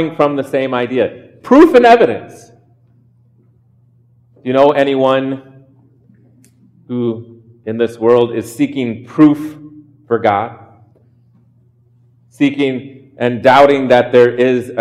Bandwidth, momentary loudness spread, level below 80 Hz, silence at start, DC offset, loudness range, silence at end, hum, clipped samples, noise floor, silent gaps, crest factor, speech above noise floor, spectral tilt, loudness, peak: 14 kHz; 17 LU; -56 dBFS; 0 s; under 0.1%; 7 LU; 0 s; none; under 0.1%; -51 dBFS; none; 14 dB; 39 dB; -6.5 dB/octave; -12 LUFS; 0 dBFS